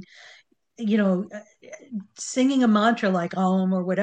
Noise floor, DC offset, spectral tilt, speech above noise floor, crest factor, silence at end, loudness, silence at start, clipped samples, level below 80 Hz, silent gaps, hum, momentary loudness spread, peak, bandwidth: -55 dBFS; under 0.1%; -6 dB/octave; 33 dB; 16 dB; 0 s; -23 LUFS; 0 s; under 0.1%; -72 dBFS; none; none; 17 LU; -8 dBFS; 9.2 kHz